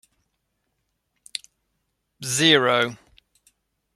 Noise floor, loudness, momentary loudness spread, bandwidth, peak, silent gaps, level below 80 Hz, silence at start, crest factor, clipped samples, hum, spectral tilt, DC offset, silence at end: -75 dBFS; -19 LUFS; 19 LU; 14.5 kHz; -2 dBFS; none; -68 dBFS; 2.2 s; 24 dB; under 0.1%; none; -2.5 dB/octave; under 0.1%; 1 s